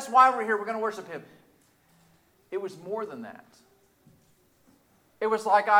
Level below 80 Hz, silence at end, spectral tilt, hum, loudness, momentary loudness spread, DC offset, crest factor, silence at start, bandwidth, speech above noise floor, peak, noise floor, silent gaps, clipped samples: -78 dBFS; 0 s; -4 dB/octave; none; -27 LUFS; 21 LU; under 0.1%; 22 dB; 0 s; 16 kHz; 38 dB; -6 dBFS; -64 dBFS; none; under 0.1%